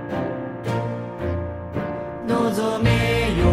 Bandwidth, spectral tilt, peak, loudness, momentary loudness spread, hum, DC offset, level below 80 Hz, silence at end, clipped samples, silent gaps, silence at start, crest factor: 14.5 kHz; -6.5 dB/octave; -6 dBFS; -23 LUFS; 10 LU; none; under 0.1%; -36 dBFS; 0 s; under 0.1%; none; 0 s; 16 dB